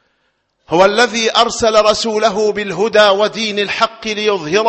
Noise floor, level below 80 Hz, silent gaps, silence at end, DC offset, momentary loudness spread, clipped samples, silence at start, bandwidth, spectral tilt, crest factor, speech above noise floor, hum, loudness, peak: -64 dBFS; -48 dBFS; none; 0 s; under 0.1%; 6 LU; under 0.1%; 0.7 s; 8.6 kHz; -3 dB/octave; 14 dB; 51 dB; none; -13 LUFS; 0 dBFS